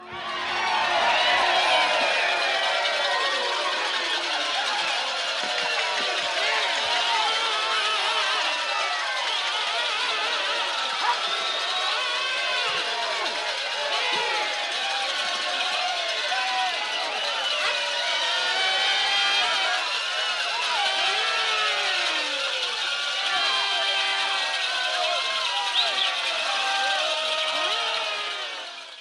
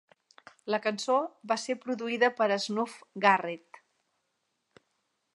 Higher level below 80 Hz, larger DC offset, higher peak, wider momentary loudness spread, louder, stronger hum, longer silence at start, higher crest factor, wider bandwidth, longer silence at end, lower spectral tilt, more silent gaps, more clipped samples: first, -70 dBFS vs -88 dBFS; neither; about the same, -10 dBFS vs -8 dBFS; second, 4 LU vs 11 LU; first, -23 LUFS vs -29 LUFS; neither; second, 0 s vs 0.65 s; second, 14 dB vs 24 dB; about the same, 12.5 kHz vs 11.5 kHz; second, 0 s vs 1.8 s; second, 1.5 dB/octave vs -3.5 dB/octave; neither; neither